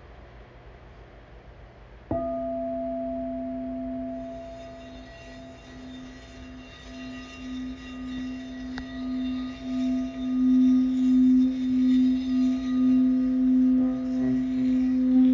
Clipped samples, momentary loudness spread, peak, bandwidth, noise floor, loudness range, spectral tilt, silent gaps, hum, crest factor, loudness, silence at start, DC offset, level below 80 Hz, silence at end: under 0.1%; 22 LU; -12 dBFS; 6.8 kHz; -47 dBFS; 17 LU; -7 dB/octave; none; none; 12 dB; -25 LUFS; 0 s; under 0.1%; -50 dBFS; 0 s